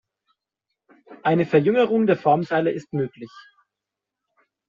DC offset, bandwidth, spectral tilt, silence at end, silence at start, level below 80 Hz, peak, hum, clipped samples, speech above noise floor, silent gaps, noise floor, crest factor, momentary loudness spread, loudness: under 0.1%; 7.4 kHz; -6 dB/octave; 1.3 s; 1.1 s; -66 dBFS; -4 dBFS; none; under 0.1%; 65 dB; none; -85 dBFS; 20 dB; 11 LU; -21 LUFS